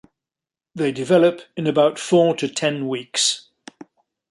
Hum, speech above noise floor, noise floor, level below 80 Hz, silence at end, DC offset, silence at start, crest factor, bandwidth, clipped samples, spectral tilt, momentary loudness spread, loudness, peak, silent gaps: none; 71 dB; -90 dBFS; -70 dBFS; 0.9 s; under 0.1%; 0.75 s; 18 dB; 11.5 kHz; under 0.1%; -4 dB/octave; 9 LU; -19 LUFS; -2 dBFS; none